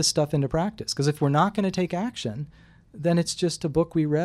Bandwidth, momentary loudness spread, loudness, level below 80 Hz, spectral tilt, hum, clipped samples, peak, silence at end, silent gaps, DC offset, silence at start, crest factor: 14 kHz; 9 LU; -25 LUFS; -50 dBFS; -5 dB/octave; none; under 0.1%; -8 dBFS; 0 s; none; under 0.1%; 0 s; 16 dB